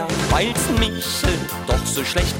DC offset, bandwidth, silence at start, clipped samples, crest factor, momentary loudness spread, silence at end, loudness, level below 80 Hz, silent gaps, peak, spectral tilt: under 0.1%; 17 kHz; 0 s; under 0.1%; 14 dB; 3 LU; 0 s; -20 LUFS; -28 dBFS; none; -6 dBFS; -4 dB/octave